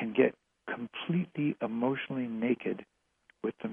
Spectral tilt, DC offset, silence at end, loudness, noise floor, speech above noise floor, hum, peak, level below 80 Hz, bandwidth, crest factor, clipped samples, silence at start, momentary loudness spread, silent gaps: -9.5 dB/octave; under 0.1%; 0 s; -33 LUFS; -69 dBFS; 37 dB; none; -12 dBFS; -76 dBFS; 3.7 kHz; 22 dB; under 0.1%; 0 s; 11 LU; none